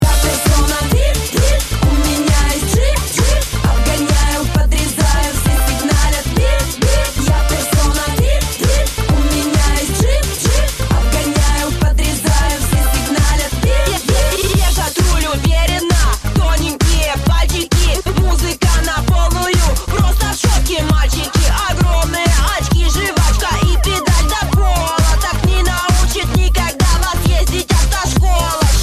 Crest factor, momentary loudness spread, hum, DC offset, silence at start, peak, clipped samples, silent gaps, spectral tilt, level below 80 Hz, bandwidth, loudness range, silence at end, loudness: 12 dB; 1 LU; none; 0.2%; 0 s; 0 dBFS; under 0.1%; none; -4 dB/octave; -16 dBFS; 15 kHz; 1 LU; 0 s; -14 LUFS